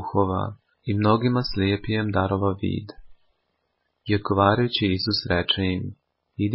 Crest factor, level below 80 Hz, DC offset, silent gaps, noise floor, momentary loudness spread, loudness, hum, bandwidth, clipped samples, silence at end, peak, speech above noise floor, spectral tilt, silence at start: 20 dB; -42 dBFS; under 0.1%; none; -74 dBFS; 14 LU; -23 LUFS; none; 5.8 kHz; under 0.1%; 0 s; -4 dBFS; 52 dB; -10.5 dB/octave; 0 s